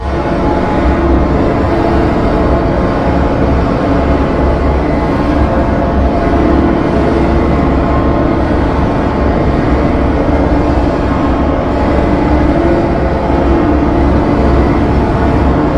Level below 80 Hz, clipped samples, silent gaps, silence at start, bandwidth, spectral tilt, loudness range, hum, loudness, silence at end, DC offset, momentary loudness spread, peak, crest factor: -16 dBFS; under 0.1%; none; 0 s; 7.8 kHz; -8.5 dB/octave; 1 LU; none; -11 LUFS; 0 s; under 0.1%; 2 LU; 0 dBFS; 10 dB